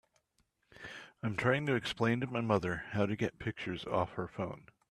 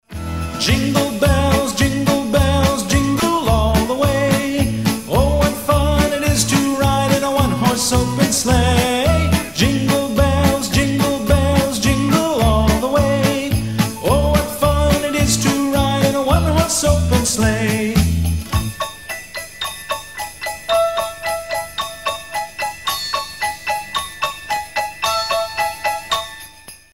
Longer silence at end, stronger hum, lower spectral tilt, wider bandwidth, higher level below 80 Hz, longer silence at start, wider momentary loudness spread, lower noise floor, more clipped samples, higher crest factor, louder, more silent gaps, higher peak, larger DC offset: about the same, 0.3 s vs 0.2 s; neither; first, -6.5 dB/octave vs -4.5 dB/octave; second, 12.5 kHz vs 16.5 kHz; second, -64 dBFS vs -26 dBFS; first, 0.75 s vs 0.1 s; first, 16 LU vs 9 LU; first, -77 dBFS vs -40 dBFS; neither; first, 22 dB vs 16 dB; second, -35 LUFS vs -17 LUFS; neither; second, -14 dBFS vs 0 dBFS; second, under 0.1% vs 0.4%